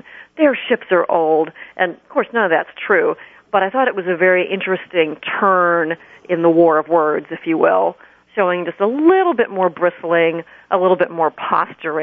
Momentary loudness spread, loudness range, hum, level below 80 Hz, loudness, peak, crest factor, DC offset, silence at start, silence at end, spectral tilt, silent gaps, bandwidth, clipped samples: 8 LU; 2 LU; none; -66 dBFS; -17 LUFS; -2 dBFS; 14 dB; under 0.1%; 0.1 s; 0 s; -9 dB/octave; none; 4.4 kHz; under 0.1%